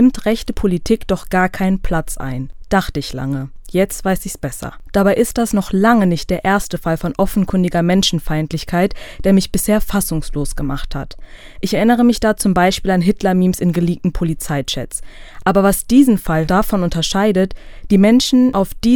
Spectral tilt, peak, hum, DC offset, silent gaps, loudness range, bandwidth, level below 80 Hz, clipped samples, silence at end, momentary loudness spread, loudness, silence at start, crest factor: -5.5 dB/octave; 0 dBFS; none; under 0.1%; none; 4 LU; 19.5 kHz; -30 dBFS; under 0.1%; 0 s; 11 LU; -16 LUFS; 0 s; 16 dB